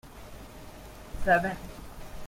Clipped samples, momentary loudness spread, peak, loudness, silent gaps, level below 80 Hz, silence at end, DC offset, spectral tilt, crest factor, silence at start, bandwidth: under 0.1%; 22 LU; -10 dBFS; -28 LUFS; none; -44 dBFS; 0 s; under 0.1%; -5.5 dB/octave; 22 dB; 0.05 s; 16.5 kHz